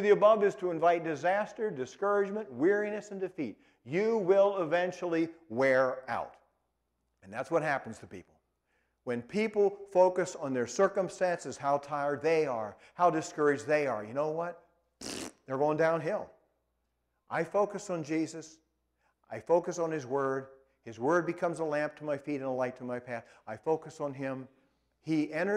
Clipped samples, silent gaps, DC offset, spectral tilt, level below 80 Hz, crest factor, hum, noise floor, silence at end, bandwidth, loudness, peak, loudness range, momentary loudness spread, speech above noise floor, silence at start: under 0.1%; none; under 0.1%; -5.5 dB/octave; -74 dBFS; 20 dB; none; -80 dBFS; 0 s; 12 kHz; -31 LUFS; -12 dBFS; 6 LU; 14 LU; 49 dB; 0 s